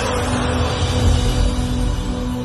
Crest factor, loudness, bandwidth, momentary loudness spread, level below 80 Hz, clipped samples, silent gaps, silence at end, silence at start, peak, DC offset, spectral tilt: 14 dB; -19 LUFS; 12.5 kHz; 5 LU; -22 dBFS; under 0.1%; none; 0 s; 0 s; -4 dBFS; under 0.1%; -5.5 dB/octave